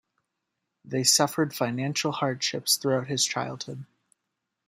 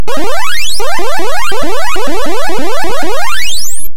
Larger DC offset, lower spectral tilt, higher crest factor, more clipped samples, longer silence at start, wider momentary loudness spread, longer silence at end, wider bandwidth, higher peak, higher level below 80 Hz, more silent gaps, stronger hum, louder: second, under 0.1% vs 90%; about the same, -3 dB/octave vs -2.5 dB/octave; first, 22 dB vs 12 dB; second, under 0.1% vs 5%; first, 0.85 s vs 0 s; first, 13 LU vs 2 LU; first, 0.85 s vs 0 s; second, 16 kHz vs over 20 kHz; second, -6 dBFS vs 0 dBFS; second, -72 dBFS vs -34 dBFS; neither; neither; second, -25 LUFS vs -16 LUFS